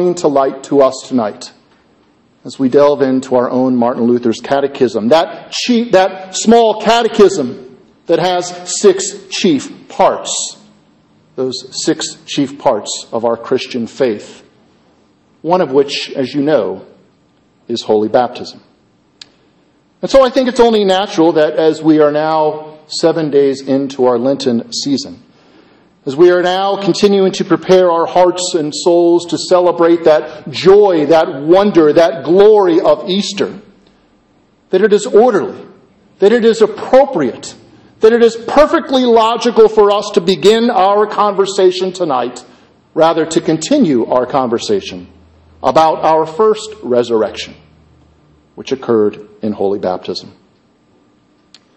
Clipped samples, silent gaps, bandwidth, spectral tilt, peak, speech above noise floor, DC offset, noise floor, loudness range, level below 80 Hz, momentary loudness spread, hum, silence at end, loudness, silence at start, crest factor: 0.1%; none; 8.6 kHz; -4.5 dB/octave; 0 dBFS; 41 dB; under 0.1%; -52 dBFS; 7 LU; -48 dBFS; 12 LU; none; 1.5 s; -12 LUFS; 0 s; 12 dB